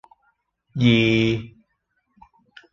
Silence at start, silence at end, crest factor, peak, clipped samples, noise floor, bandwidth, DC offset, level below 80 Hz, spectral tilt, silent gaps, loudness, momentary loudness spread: 0.75 s; 1.25 s; 20 dB; -4 dBFS; under 0.1%; -72 dBFS; 7.2 kHz; under 0.1%; -50 dBFS; -7 dB/octave; none; -19 LUFS; 13 LU